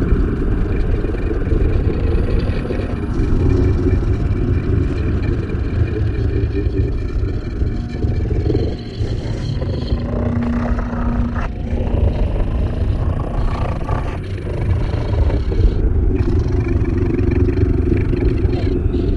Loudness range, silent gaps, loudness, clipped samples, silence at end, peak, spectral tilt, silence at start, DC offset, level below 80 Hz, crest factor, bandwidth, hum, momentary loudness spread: 3 LU; none; -19 LUFS; under 0.1%; 0 s; -2 dBFS; -9 dB/octave; 0 s; under 0.1%; -20 dBFS; 14 dB; 7 kHz; none; 5 LU